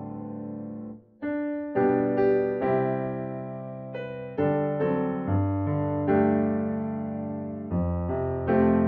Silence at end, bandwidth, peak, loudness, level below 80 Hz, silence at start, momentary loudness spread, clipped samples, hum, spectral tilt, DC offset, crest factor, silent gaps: 0 s; 4.7 kHz; -10 dBFS; -27 LUFS; -50 dBFS; 0 s; 13 LU; under 0.1%; none; -9 dB/octave; under 0.1%; 16 dB; none